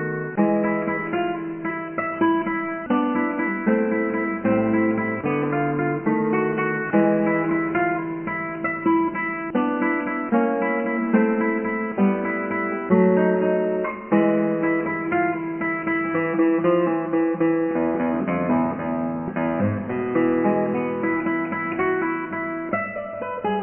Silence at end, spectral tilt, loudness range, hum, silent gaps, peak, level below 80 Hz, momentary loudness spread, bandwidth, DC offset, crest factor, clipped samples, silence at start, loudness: 0 s; -11 dB/octave; 2 LU; none; none; -6 dBFS; -58 dBFS; 6 LU; 3.2 kHz; under 0.1%; 16 dB; under 0.1%; 0 s; -22 LUFS